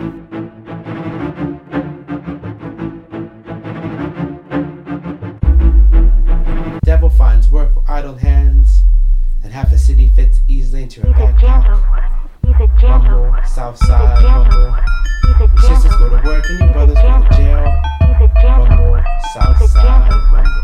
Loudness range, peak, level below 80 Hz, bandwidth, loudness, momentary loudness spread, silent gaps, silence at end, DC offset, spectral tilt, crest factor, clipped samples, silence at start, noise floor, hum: 13 LU; 0 dBFS; -8 dBFS; 7 kHz; -13 LUFS; 15 LU; none; 0 s; 0.7%; -7.5 dB/octave; 8 dB; 0.3%; 0 s; -28 dBFS; none